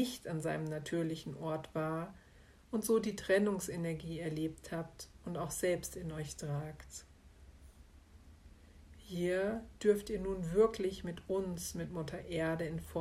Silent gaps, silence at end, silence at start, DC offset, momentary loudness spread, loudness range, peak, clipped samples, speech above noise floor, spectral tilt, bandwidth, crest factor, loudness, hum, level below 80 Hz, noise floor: none; 0 s; 0 s; under 0.1%; 12 LU; 7 LU; -18 dBFS; under 0.1%; 24 dB; -5.5 dB/octave; 16 kHz; 20 dB; -37 LUFS; none; -58 dBFS; -61 dBFS